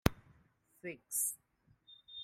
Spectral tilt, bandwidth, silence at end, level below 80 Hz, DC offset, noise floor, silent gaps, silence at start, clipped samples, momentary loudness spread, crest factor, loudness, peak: -3.5 dB/octave; 16 kHz; 0 s; -54 dBFS; under 0.1%; -71 dBFS; none; 0.05 s; under 0.1%; 22 LU; 34 dB; -38 LUFS; -8 dBFS